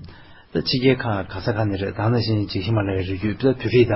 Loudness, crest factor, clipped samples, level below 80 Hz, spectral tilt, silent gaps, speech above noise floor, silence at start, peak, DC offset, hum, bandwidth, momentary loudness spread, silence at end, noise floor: -22 LUFS; 16 dB; under 0.1%; -42 dBFS; -10.5 dB/octave; none; 23 dB; 0 s; -4 dBFS; under 0.1%; none; 5.8 kHz; 7 LU; 0 s; -43 dBFS